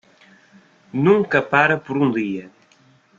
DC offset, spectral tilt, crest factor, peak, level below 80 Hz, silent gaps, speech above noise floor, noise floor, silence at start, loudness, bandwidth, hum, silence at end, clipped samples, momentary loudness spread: under 0.1%; -7.5 dB/octave; 20 dB; -2 dBFS; -62 dBFS; none; 37 dB; -55 dBFS; 0.95 s; -18 LUFS; 7.4 kHz; none; 0.7 s; under 0.1%; 12 LU